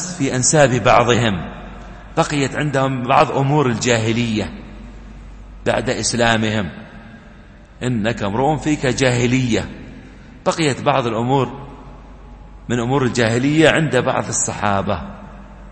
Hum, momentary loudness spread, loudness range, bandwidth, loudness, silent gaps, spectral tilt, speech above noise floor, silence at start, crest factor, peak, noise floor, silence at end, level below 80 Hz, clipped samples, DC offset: none; 22 LU; 4 LU; 8.8 kHz; -17 LUFS; none; -4.5 dB/octave; 25 dB; 0 s; 18 dB; 0 dBFS; -41 dBFS; 0 s; -40 dBFS; under 0.1%; under 0.1%